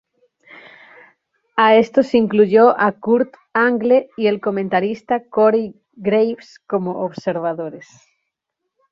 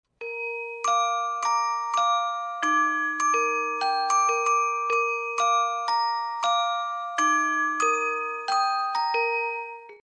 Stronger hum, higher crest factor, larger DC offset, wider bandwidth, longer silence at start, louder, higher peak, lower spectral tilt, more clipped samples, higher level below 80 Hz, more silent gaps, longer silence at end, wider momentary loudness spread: neither; about the same, 16 dB vs 14 dB; neither; second, 7.2 kHz vs 10 kHz; first, 1.55 s vs 0.2 s; first, -17 LUFS vs -24 LUFS; first, -2 dBFS vs -12 dBFS; first, -7 dB/octave vs 1 dB/octave; neither; first, -62 dBFS vs -84 dBFS; neither; first, 1.1 s vs 0.05 s; first, 12 LU vs 7 LU